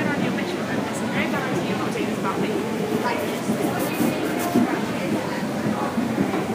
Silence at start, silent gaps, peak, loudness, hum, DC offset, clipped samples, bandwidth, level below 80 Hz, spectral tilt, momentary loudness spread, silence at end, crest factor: 0 s; none; -6 dBFS; -24 LUFS; none; under 0.1%; under 0.1%; 15.5 kHz; -58 dBFS; -5.5 dB/octave; 3 LU; 0 s; 18 dB